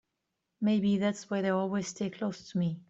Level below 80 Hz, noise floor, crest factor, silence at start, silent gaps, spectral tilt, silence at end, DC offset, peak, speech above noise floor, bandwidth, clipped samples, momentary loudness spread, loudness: -70 dBFS; -84 dBFS; 14 dB; 0.6 s; none; -6 dB/octave; 0.1 s; under 0.1%; -16 dBFS; 53 dB; 8 kHz; under 0.1%; 7 LU; -31 LUFS